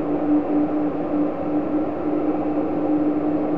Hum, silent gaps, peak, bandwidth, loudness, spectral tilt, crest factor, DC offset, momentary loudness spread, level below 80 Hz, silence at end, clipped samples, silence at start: none; none; -10 dBFS; 3.8 kHz; -22 LUFS; -10.5 dB/octave; 12 dB; 2%; 3 LU; -50 dBFS; 0 s; under 0.1%; 0 s